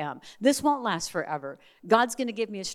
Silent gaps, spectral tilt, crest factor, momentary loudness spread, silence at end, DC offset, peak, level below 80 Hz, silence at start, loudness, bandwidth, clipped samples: none; -3.5 dB/octave; 22 dB; 13 LU; 0 s; under 0.1%; -6 dBFS; -66 dBFS; 0 s; -27 LUFS; 16 kHz; under 0.1%